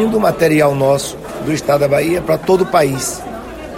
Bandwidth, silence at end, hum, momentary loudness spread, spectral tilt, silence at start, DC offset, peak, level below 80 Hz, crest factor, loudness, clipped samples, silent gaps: 16.5 kHz; 0 s; none; 12 LU; -5 dB/octave; 0 s; under 0.1%; 0 dBFS; -40 dBFS; 14 dB; -15 LUFS; under 0.1%; none